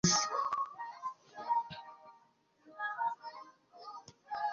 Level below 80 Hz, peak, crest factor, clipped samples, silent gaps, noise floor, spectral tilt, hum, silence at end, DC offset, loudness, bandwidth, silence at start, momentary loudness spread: -68 dBFS; -16 dBFS; 22 dB; under 0.1%; none; -69 dBFS; -2.5 dB/octave; none; 0 s; under 0.1%; -37 LUFS; 7.2 kHz; 0.05 s; 20 LU